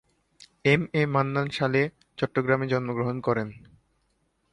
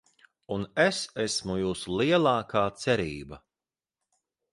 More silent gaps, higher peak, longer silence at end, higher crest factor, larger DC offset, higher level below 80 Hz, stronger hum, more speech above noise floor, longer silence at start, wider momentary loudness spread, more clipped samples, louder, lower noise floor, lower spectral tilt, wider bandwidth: neither; first, -6 dBFS vs -10 dBFS; second, 0.95 s vs 1.15 s; about the same, 20 dB vs 20 dB; neither; about the same, -60 dBFS vs -56 dBFS; neither; second, 46 dB vs over 63 dB; about the same, 0.4 s vs 0.5 s; second, 7 LU vs 12 LU; neither; about the same, -26 LUFS vs -27 LUFS; second, -71 dBFS vs under -90 dBFS; first, -7 dB/octave vs -4.5 dB/octave; about the same, 11 kHz vs 11.5 kHz